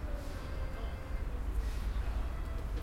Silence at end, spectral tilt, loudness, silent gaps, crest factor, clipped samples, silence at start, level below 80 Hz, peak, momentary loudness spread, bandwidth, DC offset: 0 s; -6.5 dB/octave; -40 LUFS; none; 12 dB; under 0.1%; 0 s; -36 dBFS; -24 dBFS; 4 LU; 15 kHz; under 0.1%